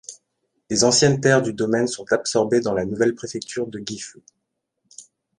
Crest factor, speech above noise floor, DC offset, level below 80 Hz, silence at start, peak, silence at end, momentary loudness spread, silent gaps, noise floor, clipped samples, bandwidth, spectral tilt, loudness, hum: 20 dB; 56 dB; under 0.1%; -58 dBFS; 0.1 s; -2 dBFS; 0.35 s; 15 LU; none; -76 dBFS; under 0.1%; 11.5 kHz; -4 dB/octave; -20 LUFS; none